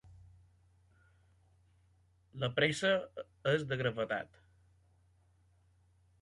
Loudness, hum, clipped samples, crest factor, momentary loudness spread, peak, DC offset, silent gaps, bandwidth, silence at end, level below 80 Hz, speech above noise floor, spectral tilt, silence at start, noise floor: -34 LUFS; none; under 0.1%; 22 dB; 16 LU; -18 dBFS; under 0.1%; none; 11 kHz; 1.95 s; -68 dBFS; 36 dB; -5 dB/octave; 0.05 s; -69 dBFS